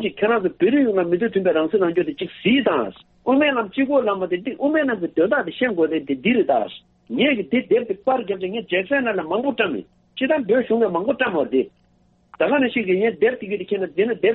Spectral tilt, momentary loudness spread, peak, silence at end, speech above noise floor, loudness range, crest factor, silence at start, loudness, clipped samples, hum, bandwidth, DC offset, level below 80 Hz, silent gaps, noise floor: -3.5 dB/octave; 7 LU; -4 dBFS; 0 s; 39 dB; 2 LU; 16 dB; 0 s; -20 LUFS; under 0.1%; none; 4.1 kHz; under 0.1%; -62 dBFS; none; -59 dBFS